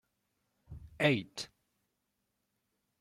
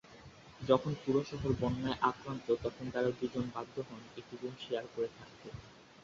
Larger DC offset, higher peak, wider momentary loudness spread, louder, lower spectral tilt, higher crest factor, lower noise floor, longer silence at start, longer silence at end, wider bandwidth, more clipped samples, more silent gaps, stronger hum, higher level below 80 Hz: neither; about the same, -14 dBFS vs -14 dBFS; first, 23 LU vs 19 LU; first, -32 LUFS vs -36 LUFS; about the same, -5 dB/octave vs -5.5 dB/octave; about the same, 26 dB vs 24 dB; first, -83 dBFS vs -56 dBFS; first, 0.7 s vs 0.05 s; first, 1.55 s vs 0 s; first, 14 kHz vs 7.6 kHz; neither; neither; neither; about the same, -64 dBFS vs -60 dBFS